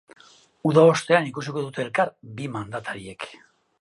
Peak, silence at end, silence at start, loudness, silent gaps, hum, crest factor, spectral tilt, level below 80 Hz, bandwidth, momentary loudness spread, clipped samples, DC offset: -2 dBFS; 0.45 s; 0.65 s; -23 LUFS; none; none; 22 dB; -6 dB/octave; -64 dBFS; 11.5 kHz; 18 LU; under 0.1%; under 0.1%